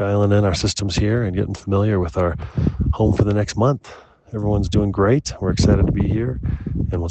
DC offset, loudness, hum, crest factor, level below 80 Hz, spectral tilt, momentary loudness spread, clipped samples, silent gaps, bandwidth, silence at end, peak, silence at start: under 0.1%; -20 LUFS; none; 16 dB; -30 dBFS; -6.5 dB/octave; 7 LU; under 0.1%; none; 8.6 kHz; 0 s; -2 dBFS; 0 s